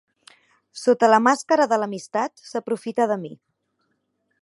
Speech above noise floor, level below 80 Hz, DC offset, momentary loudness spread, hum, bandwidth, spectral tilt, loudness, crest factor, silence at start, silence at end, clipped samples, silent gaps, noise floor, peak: 51 dB; -80 dBFS; under 0.1%; 13 LU; none; 11.5 kHz; -4.5 dB/octave; -21 LUFS; 20 dB; 0.75 s; 1.1 s; under 0.1%; none; -72 dBFS; -2 dBFS